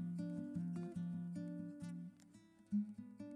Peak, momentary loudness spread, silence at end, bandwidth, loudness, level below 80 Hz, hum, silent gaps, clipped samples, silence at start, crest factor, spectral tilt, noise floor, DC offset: -32 dBFS; 14 LU; 0 s; 10.5 kHz; -46 LUFS; -80 dBFS; none; none; under 0.1%; 0 s; 14 dB; -9 dB/octave; -65 dBFS; under 0.1%